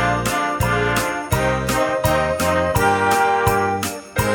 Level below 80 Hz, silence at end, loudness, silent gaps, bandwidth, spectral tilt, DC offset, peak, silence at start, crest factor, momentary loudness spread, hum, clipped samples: -34 dBFS; 0 s; -19 LUFS; none; over 20 kHz; -4.5 dB/octave; under 0.1%; -2 dBFS; 0 s; 16 dB; 5 LU; none; under 0.1%